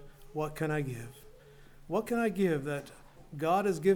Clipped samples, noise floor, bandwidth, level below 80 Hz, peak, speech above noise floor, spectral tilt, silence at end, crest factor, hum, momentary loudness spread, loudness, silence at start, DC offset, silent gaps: under 0.1%; -54 dBFS; 18.5 kHz; -56 dBFS; -14 dBFS; 23 dB; -6.5 dB/octave; 0 s; 18 dB; none; 15 LU; -33 LUFS; 0 s; under 0.1%; none